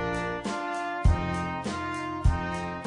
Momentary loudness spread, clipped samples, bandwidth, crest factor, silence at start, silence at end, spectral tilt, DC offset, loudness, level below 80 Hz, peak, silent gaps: 6 LU; under 0.1%; 10.5 kHz; 18 dB; 0 s; 0 s; -6 dB/octave; under 0.1%; -30 LUFS; -32 dBFS; -10 dBFS; none